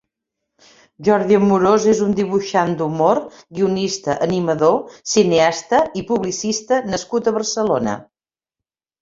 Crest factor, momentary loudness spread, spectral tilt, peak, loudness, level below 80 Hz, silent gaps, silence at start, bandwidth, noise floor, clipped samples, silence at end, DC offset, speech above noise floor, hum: 16 dB; 8 LU; -5 dB/octave; -2 dBFS; -18 LUFS; -54 dBFS; none; 1 s; 7.8 kHz; under -90 dBFS; under 0.1%; 1 s; under 0.1%; over 73 dB; none